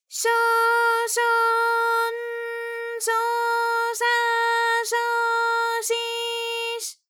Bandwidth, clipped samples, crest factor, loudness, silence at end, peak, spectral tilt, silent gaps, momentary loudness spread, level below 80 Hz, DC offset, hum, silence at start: 19.5 kHz; under 0.1%; 12 dB; -22 LUFS; 0.15 s; -10 dBFS; 5 dB/octave; none; 8 LU; under -90 dBFS; under 0.1%; none; 0.1 s